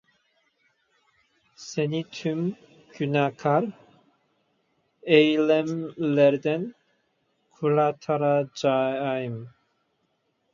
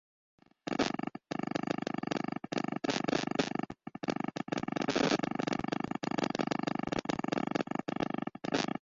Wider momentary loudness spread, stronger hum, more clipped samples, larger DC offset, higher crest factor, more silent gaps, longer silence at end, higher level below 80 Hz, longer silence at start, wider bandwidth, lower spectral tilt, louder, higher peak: first, 14 LU vs 6 LU; neither; neither; neither; about the same, 22 dB vs 22 dB; neither; first, 1.05 s vs 0.05 s; second, -74 dBFS vs -66 dBFS; first, 1.6 s vs 0.65 s; about the same, 7.4 kHz vs 7.8 kHz; first, -6.5 dB/octave vs -5 dB/octave; first, -24 LUFS vs -35 LUFS; first, -4 dBFS vs -14 dBFS